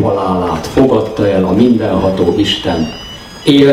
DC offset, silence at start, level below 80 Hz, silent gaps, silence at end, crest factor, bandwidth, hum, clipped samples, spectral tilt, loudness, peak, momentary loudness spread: under 0.1%; 0 s; -34 dBFS; none; 0 s; 12 dB; 15 kHz; none; 0.2%; -6.5 dB/octave; -12 LUFS; 0 dBFS; 7 LU